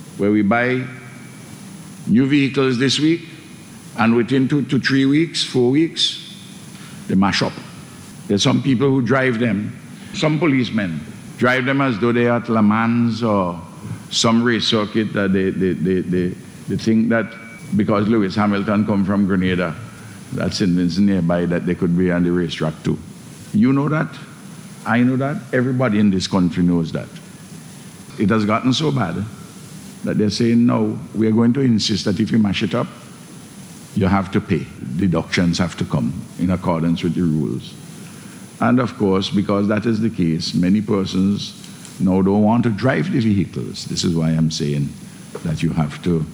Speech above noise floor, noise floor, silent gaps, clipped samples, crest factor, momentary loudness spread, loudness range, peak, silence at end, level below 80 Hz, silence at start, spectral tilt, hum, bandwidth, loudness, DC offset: 21 dB; -38 dBFS; none; under 0.1%; 16 dB; 20 LU; 3 LU; -2 dBFS; 0 s; -50 dBFS; 0 s; -6 dB/octave; none; 16 kHz; -18 LUFS; under 0.1%